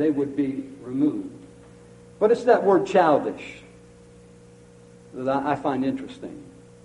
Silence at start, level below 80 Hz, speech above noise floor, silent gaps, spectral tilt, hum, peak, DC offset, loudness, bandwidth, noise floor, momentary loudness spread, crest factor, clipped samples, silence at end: 0 s; -60 dBFS; 26 dB; none; -7 dB/octave; 60 Hz at -60 dBFS; -4 dBFS; under 0.1%; -23 LUFS; 11 kHz; -49 dBFS; 21 LU; 20 dB; under 0.1%; 0.35 s